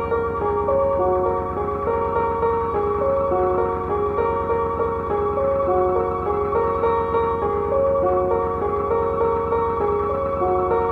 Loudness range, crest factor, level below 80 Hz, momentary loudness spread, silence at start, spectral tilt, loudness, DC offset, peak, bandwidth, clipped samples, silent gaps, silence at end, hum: 1 LU; 12 dB; -40 dBFS; 3 LU; 0 s; -9.5 dB/octave; -21 LUFS; under 0.1%; -8 dBFS; 4.8 kHz; under 0.1%; none; 0 s; none